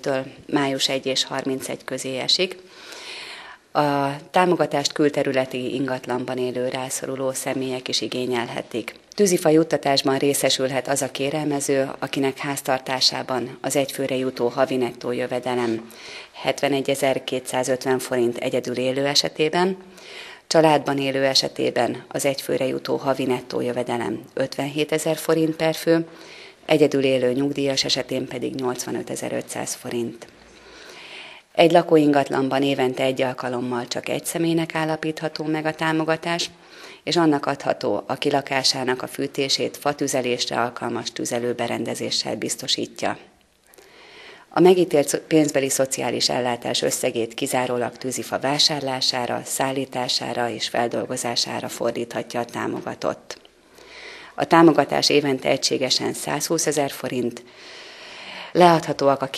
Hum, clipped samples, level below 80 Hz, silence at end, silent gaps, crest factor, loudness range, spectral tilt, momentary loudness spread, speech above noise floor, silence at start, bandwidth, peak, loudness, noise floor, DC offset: none; under 0.1%; -66 dBFS; 0 s; none; 22 dB; 4 LU; -3.5 dB/octave; 11 LU; 32 dB; 0.05 s; 14.5 kHz; 0 dBFS; -22 LUFS; -54 dBFS; under 0.1%